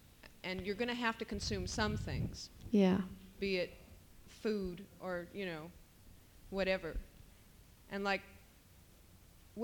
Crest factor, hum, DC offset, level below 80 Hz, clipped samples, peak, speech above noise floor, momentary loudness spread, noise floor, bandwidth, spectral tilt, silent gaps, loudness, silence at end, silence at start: 22 dB; none; under 0.1%; -54 dBFS; under 0.1%; -18 dBFS; 25 dB; 19 LU; -62 dBFS; 19 kHz; -5.5 dB/octave; none; -39 LUFS; 0 s; 0.05 s